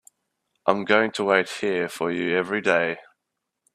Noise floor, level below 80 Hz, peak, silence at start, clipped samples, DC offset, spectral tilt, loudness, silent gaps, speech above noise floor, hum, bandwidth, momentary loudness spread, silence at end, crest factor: -81 dBFS; -68 dBFS; -2 dBFS; 0.65 s; under 0.1%; under 0.1%; -4.5 dB/octave; -23 LUFS; none; 59 dB; none; 14 kHz; 7 LU; 0.75 s; 24 dB